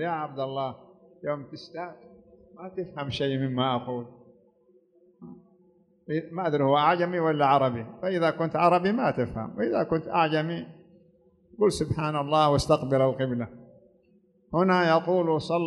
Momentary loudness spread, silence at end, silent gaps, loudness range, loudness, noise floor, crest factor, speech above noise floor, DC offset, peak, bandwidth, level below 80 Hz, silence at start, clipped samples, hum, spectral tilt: 15 LU; 0 s; none; 8 LU; -26 LUFS; -63 dBFS; 18 dB; 37 dB; under 0.1%; -8 dBFS; 11.5 kHz; -56 dBFS; 0 s; under 0.1%; none; -6.5 dB/octave